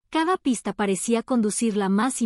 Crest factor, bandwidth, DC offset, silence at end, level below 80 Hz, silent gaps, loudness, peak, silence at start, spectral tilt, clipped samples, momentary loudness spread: 14 dB; 13.5 kHz; under 0.1%; 0 s; -62 dBFS; none; -23 LUFS; -10 dBFS; 0.1 s; -4.5 dB/octave; under 0.1%; 3 LU